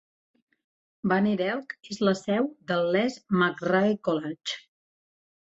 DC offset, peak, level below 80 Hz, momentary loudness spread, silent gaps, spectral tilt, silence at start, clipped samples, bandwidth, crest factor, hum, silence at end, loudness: under 0.1%; -10 dBFS; -70 dBFS; 10 LU; none; -6 dB/octave; 1.05 s; under 0.1%; 8 kHz; 18 dB; none; 1 s; -27 LUFS